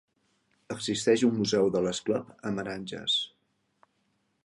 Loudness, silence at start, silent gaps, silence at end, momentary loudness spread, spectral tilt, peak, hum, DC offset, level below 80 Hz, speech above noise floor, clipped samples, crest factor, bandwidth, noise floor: -28 LUFS; 0.7 s; none; 1.15 s; 11 LU; -4.5 dB/octave; -12 dBFS; none; under 0.1%; -66 dBFS; 46 dB; under 0.1%; 18 dB; 11.5 kHz; -74 dBFS